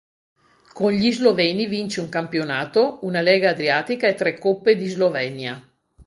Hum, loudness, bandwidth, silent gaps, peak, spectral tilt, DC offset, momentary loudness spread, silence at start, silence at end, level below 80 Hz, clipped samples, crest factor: none; -20 LUFS; 11.5 kHz; none; -2 dBFS; -5.5 dB/octave; under 0.1%; 8 LU; 0.75 s; 0.05 s; -62 dBFS; under 0.1%; 18 dB